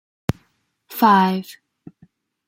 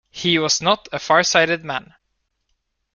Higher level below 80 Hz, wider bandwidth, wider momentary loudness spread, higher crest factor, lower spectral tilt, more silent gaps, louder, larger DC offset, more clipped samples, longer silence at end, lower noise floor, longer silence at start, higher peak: first, -52 dBFS vs -58 dBFS; first, 16.5 kHz vs 10 kHz; first, 22 LU vs 10 LU; about the same, 20 dB vs 20 dB; first, -6 dB/octave vs -2.5 dB/octave; neither; about the same, -18 LUFS vs -18 LUFS; neither; neither; second, 0.95 s vs 1.1 s; second, -65 dBFS vs -73 dBFS; first, 0.9 s vs 0.15 s; about the same, -2 dBFS vs -2 dBFS